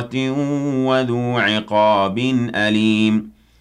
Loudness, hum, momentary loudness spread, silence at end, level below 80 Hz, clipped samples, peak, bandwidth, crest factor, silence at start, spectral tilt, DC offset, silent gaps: -18 LUFS; none; 5 LU; 0.3 s; -56 dBFS; under 0.1%; -6 dBFS; 10 kHz; 12 dB; 0 s; -6 dB/octave; under 0.1%; none